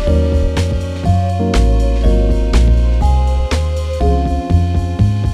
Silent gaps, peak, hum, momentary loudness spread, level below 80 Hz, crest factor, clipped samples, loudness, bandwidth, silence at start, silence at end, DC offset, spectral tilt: none; -2 dBFS; none; 4 LU; -14 dBFS; 12 dB; under 0.1%; -15 LUFS; 10.5 kHz; 0 s; 0 s; under 0.1%; -7 dB/octave